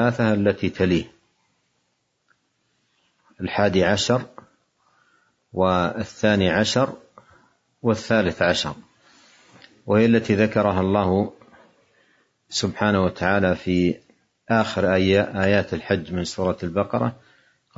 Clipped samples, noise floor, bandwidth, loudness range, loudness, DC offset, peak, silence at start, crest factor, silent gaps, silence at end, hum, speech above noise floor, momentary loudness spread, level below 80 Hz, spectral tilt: under 0.1%; -72 dBFS; 8 kHz; 4 LU; -21 LUFS; under 0.1%; -4 dBFS; 0 s; 18 dB; none; 0.65 s; none; 51 dB; 9 LU; -56 dBFS; -5.5 dB/octave